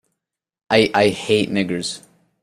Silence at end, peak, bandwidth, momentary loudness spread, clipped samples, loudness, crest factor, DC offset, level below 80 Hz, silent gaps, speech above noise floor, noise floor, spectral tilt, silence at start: 0.45 s; -2 dBFS; 14 kHz; 11 LU; under 0.1%; -18 LUFS; 18 dB; under 0.1%; -56 dBFS; none; 61 dB; -78 dBFS; -4.5 dB/octave; 0.7 s